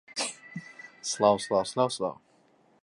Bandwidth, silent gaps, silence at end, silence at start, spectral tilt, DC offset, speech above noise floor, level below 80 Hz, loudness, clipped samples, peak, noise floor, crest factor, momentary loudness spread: 11.5 kHz; none; 0.7 s; 0.1 s; -3.5 dB/octave; under 0.1%; 37 dB; -70 dBFS; -28 LUFS; under 0.1%; -8 dBFS; -64 dBFS; 22 dB; 18 LU